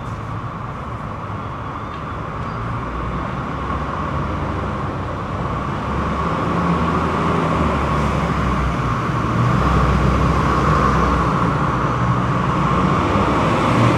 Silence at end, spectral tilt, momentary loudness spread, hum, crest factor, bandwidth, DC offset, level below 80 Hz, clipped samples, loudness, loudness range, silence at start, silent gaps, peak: 0 s; -7 dB/octave; 11 LU; none; 16 dB; 12 kHz; under 0.1%; -28 dBFS; under 0.1%; -19 LUFS; 8 LU; 0 s; none; -4 dBFS